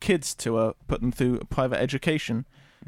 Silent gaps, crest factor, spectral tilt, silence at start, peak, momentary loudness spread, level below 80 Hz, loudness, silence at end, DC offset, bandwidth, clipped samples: none; 18 dB; -5.5 dB/octave; 0 s; -8 dBFS; 5 LU; -44 dBFS; -27 LUFS; 0.45 s; under 0.1%; 16.5 kHz; under 0.1%